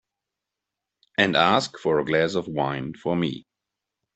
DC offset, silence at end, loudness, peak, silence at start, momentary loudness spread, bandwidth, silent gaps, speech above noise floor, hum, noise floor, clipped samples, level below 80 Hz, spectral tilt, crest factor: under 0.1%; 0.75 s; -23 LUFS; -2 dBFS; 1.2 s; 10 LU; 8.4 kHz; none; 63 dB; none; -86 dBFS; under 0.1%; -62 dBFS; -5 dB/octave; 22 dB